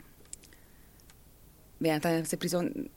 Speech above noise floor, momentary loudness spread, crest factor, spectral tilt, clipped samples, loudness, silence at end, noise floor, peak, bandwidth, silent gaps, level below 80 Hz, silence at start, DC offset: 26 dB; 19 LU; 20 dB; -5 dB/octave; under 0.1%; -31 LUFS; 0.05 s; -57 dBFS; -16 dBFS; 17 kHz; none; -60 dBFS; 0 s; under 0.1%